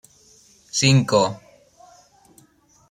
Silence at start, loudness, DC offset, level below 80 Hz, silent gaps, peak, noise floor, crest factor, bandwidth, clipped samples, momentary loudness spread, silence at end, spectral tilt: 0.75 s; -19 LUFS; under 0.1%; -60 dBFS; none; -4 dBFS; -57 dBFS; 20 dB; 12 kHz; under 0.1%; 12 LU; 1.55 s; -4.5 dB/octave